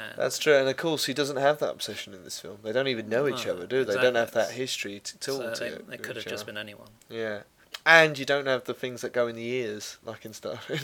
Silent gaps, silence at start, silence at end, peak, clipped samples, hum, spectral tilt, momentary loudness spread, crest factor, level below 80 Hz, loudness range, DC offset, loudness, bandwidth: none; 0 s; 0 s; 0 dBFS; under 0.1%; none; -3.5 dB/octave; 16 LU; 26 dB; -72 dBFS; 7 LU; under 0.1%; -27 LUFS; 19 kHz